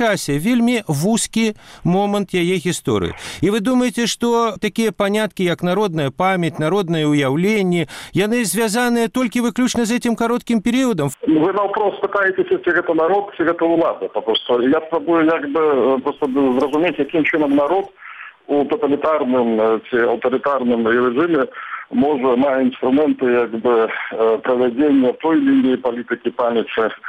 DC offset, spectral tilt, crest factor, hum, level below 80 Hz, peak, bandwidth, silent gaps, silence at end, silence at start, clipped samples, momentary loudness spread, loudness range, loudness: under 0.1%; -5 dB/octave; 12 dB; none; -52 dBFS; -6 dBFS; 15.5 kHz; none; 0 s; 0 s; under 0.1%; 4 LU; 2 LU; -17 LUFS